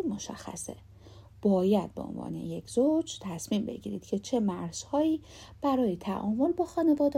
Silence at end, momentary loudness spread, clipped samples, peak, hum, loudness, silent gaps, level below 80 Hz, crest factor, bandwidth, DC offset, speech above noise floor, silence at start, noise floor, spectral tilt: 0 s; 12 LU; under 0.1%; -14 dBFS; none; -30 LUFS; none; -58 dBFS; 16 dB; 15.5 kHz; under 0.1%; 22 dB; 0 s; -52 dBFS; -6 dB/octave